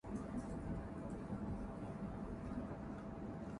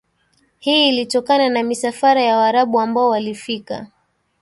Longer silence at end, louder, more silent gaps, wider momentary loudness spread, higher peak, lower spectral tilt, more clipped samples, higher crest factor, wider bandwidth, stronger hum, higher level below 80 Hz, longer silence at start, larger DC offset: second, 0 s vs 0.55 s; second, -47 LUFS vs -16 LUFS; neither; second, 3 LU vs 12 LU; second, -32 dBFS vs -4 dBFS; first, -8.5 dB/octave vs -3.5 dB/octave; neither; about the same, 14 dB vs 14 dB; about the same, 11 kHz vs 11.5 kHz; neither; first, -54 dBFS vs -64 dBFS; second, 0.05 s vs 0.65 s; neither